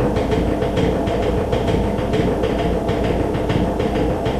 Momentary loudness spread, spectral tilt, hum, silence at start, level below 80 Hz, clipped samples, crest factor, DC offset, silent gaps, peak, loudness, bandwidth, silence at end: 1 LU; -7.5 dB/octave; none; 0 s; -28 dBFS; under 0.1%; 12 dB; under 0.1%; none; -6 dBFS; -19 LUFS; 14.5 kHz; 0 s